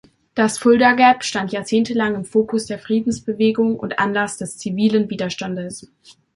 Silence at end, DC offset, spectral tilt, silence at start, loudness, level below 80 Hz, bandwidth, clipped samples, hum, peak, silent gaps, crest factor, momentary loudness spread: 0.5 s; under 0.1%; -4.5 dB/octave; 0.35 s; -19 LUFS; -56 dBFS; 11.5 kHz; under 0.1%; none; -2 dBFS; none; 16 dB; 13 LU